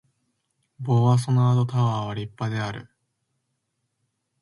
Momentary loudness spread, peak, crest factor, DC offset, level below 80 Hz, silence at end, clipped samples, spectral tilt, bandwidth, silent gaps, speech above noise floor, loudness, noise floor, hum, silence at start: 13 LU; -8 dBFS; 18 dB; under 0.1%; -60 dBFS; 1.6 s; under 0.1%; -7.5 dB/octave; 11.5 kHz; none; 55 dB; -23 LUFS; -76 dBFS; none; 0.8 s